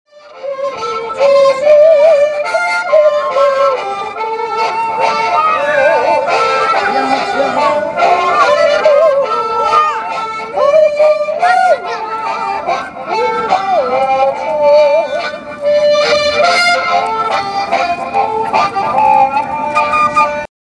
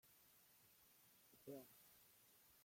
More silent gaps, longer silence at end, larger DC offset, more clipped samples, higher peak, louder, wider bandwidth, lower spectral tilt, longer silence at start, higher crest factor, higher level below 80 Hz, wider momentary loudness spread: neither; first, 0.15 s vs 0 s; neither; neither; first, 0 dBFS vs -44 dBFS; first, -12 LUFS vs -63 LUFS; second, 10.5 kHz vs 16.5 kHz; about the same, -3 dB/octave vs -4 dB/octave; first, 0.25 s vs 0.05 s; second, 12 dB vs 22 dB; first, -52 dBFS vs under -90 dBFS; about the same, 9 LU vs 10 LU